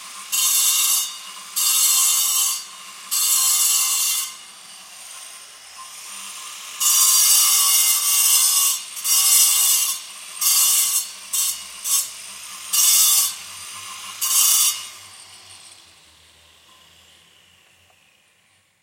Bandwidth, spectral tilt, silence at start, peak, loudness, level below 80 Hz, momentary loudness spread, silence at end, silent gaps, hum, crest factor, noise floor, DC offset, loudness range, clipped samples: 16.5 kHz; 5 dB/octave; 0 s; -2 dBFS; -15 LUFS; -76 dBFS; 21 LU; 3.15 s; none; none; 20 dB; -60 dBFS; under 0.1%; 7 LU; under 0.1%